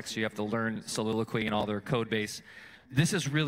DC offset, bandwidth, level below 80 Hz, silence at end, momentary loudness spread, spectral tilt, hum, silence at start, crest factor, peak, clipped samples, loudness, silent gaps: under 0.1%; 16 kHz; -62 dBFS; 0 s; 9 LU; -5 dB/octave; none; 0 s; 18 dB; -14 dBFS; under 0.1%; -31 LUFS; none